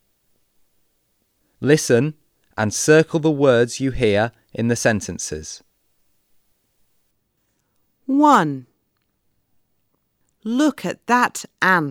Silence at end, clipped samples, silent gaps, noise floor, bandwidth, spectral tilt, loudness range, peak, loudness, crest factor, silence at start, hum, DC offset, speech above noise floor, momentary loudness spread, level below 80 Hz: 0 s; under 0.1%; none; -70 dBFS; 16.5 kHz; -5 dB/octave; 8 LU; -2 dBFS; -18 LUFS; 20 dB; 1.6 s; none; under 0.1%; 52 dB; 15 LU; -48 dBFS